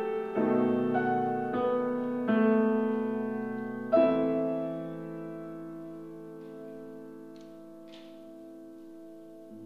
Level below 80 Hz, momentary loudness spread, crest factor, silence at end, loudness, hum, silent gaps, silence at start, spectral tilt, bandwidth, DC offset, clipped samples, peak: -72 dBFS; 23 LU; 18 dB; 0 s; -29 LUFS; none; none; 0 s; -8.5 dB/octave; 5.4 kHz; 0.1%; under 0.1%; -14 dBFS